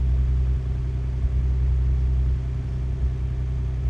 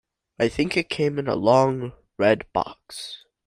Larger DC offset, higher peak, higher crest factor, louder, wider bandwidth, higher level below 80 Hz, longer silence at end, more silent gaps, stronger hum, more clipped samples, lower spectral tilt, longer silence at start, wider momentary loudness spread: neither; second, -12 dBFS vs -4 dBFS; second, 10 dB vs 20 dB; about the same, -25 LUFS vs -23 LUFS; second, 3.7 kHz vs 15 kHz; first, -24 dBFS vs -54 dBFS; second, 0 s vs 0.3 s; neither; neither; neither; first, -9 dB/octave vs -6 dB/octave; second, 0 s vs 0.4 s; second, 4 LU vs 16 LU